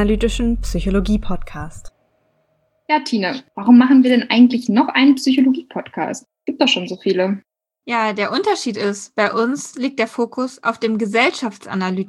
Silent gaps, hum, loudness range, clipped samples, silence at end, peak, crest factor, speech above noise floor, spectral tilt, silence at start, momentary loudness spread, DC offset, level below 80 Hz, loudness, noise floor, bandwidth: none; none; 6 LU; under 0.1%; 0 s; -2 dBFS; 16 dB; 47 dB; -5 dB/octave; 0 s; 13 LU; under 0.1%; -32 dBFS; -17 LUFS; -64 dBFS; 12 kHz